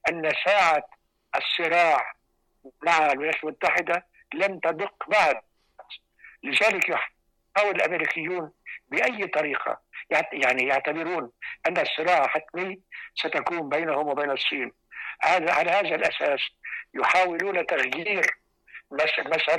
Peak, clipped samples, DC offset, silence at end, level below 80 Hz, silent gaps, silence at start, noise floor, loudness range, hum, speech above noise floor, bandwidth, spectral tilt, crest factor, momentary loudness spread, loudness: -12 dBFS; under 0.1%; under 0.1%; 0 s; -68 dBFS; none; 0.05 s; -50 dBFS; 3 LU; none; 25 dB; 15 kHz; -3 dB/octave; 14 dB; 14 LU; -24 LUFS